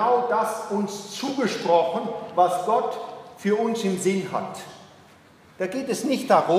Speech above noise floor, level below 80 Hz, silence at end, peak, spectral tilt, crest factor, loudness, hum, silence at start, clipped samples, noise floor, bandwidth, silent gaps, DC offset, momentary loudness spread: 29 dB; -72 dBFS; 0 s; -4 dBFS; -5 dB/octave; 20 dB; -24 LUFS; none; 0 s; under 0.1%; -52 dBFS; 15.5 kHz; none; under 0.1%; 10 LU